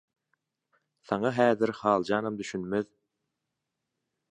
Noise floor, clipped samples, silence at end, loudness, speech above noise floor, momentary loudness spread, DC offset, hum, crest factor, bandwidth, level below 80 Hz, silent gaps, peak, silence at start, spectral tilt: -85 dBFS; under 0.1%; 1.45 s; -28 LUFS; 57 dB; 9 LU; under 0.1%; none; 24 dB; 10 kHz; -68 dBFS; none; -8 dBFS; 1.1 s; -6 dB/octave